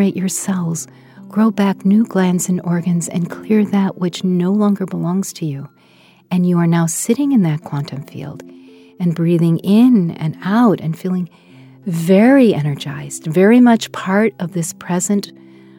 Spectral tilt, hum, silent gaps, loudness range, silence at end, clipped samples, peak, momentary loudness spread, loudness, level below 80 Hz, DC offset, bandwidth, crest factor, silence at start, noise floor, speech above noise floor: -6 dB/octave; none; none; 4 LU; 0.5 s; under 0.1%; 0 dBFS; 14 LU; -16 LUFS; -66 dBFS; under 0.1%; 16.5 kHz; 16 dB; 0 s; -49 dBFS; 34 dB